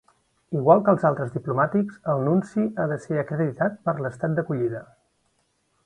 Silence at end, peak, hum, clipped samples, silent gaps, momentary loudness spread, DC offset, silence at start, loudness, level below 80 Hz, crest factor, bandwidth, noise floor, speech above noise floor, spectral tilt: 1 s; -4 dBFS; none; under 0.1%; none; 9 LU; under 0.1%; 0.5 s; -24 LUFS; -64 dBFS; 22 dB; 10 kHz; -69 dBFS; 47 dB; -10 dB/octave